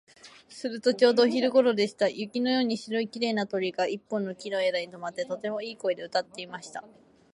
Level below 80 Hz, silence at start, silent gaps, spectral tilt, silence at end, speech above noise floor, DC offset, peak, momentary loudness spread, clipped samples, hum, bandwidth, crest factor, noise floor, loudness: -78 dBFS; 0.25 s; none; -4.5 dB/octave; 0.45 s; 24 dB; under 0.1%; -8 dBFS; 15 LU; under 0.1%; none; 11 kHz; 20 dB; -52 dBFS; -27 LUFS